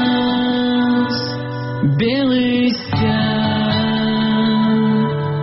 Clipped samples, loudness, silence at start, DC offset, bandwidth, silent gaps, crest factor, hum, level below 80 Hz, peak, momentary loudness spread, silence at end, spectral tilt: under 0.1%; -17 LUFS; 0 s; 0.2%; 6 kHz; none; 12 dB; none; -46 dBFS; -6 dBFS; 4 LU; 0 s; -5 dB/octave